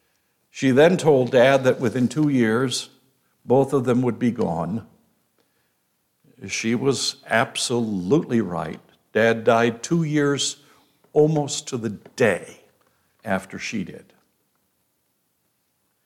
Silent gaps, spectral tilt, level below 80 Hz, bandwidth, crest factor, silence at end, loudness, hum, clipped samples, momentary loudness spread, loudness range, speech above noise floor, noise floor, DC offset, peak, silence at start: none; -5 dB/octave; -64 dBFS; 15.5 kHz; 18 dB; 2.05 s; -21 LUFS; none; under 0.1%; 13 LU; 9 LU; 50 dB; -70 dBFS; under 0.1%; -4 dBFS; 0.55 s